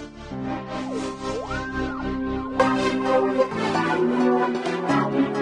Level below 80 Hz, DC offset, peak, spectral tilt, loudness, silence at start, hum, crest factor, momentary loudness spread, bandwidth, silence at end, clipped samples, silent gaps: -44 dBFS; under 0.1%; -4 dBFS; -6 dB/octave; -24 LUFS; 0 s; none; 18 dB; 9 LU; 11 kHz; 0 s; under 0.1%; none